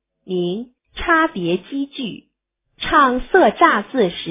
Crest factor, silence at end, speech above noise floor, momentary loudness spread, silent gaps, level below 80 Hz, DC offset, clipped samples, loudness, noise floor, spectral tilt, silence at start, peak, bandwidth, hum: 18 dB; 0 s; 54 dB; 14 LU; none; -44 dBFS; under 0.1%; under 0.1%; -17 LUFS; -71 dBFS; -9 dB/octave; 0.3 s; 0 dBFS; 3.9 kHz; none